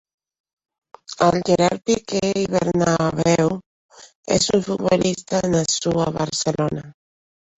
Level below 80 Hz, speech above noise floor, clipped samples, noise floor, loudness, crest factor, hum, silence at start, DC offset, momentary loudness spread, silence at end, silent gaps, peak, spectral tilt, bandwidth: -50 dBFS; over 71 dB; under 0.1%; under -90 dBFS; -20 LUFS; 20 dB; none; 1.1 s; under 0.1%; 5 LU; 0.7 s; 3.66-3.89 s, 4.15-4.23 s; -2 dBFS; -4.5 dB/octave; 8.4 kHz